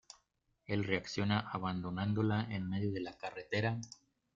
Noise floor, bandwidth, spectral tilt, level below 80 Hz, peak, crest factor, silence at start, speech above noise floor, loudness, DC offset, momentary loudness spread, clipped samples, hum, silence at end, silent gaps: -79 dBFS; 7.6 kHz; -6.5 dB/octave; -68 dBFS; -16 dBFS; 22 dB; 0.7 s; 43 dB; -37 LUFS; under 0.1%; 10 LU; under 0.1%; none; 0.4 s; none